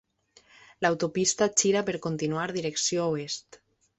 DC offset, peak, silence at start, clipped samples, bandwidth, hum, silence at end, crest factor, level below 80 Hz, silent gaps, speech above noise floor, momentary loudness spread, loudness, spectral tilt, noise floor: under 0.1%; -8 dBFS; 0.8 s; under 0.1%; 8.2 kHz; none; 0.6 s; 22 dB; -66 dBFS; none; 34 dB; 8 LU; -27 LUFS; -3 dB/octave; -61 dBFS